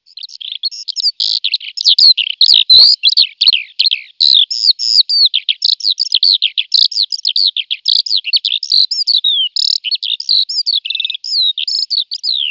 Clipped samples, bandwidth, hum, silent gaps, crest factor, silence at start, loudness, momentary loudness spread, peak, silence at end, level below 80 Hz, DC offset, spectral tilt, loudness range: 0.3%; 6 kHz; 50 Hz at -80 dBFS; none; 12 dB; 0.25 s; -9 LUFS; 9 LU; 0 dBFS; 0 s; -60 dBFS; under 0.1%; 3.5 dB/octave; 5 LU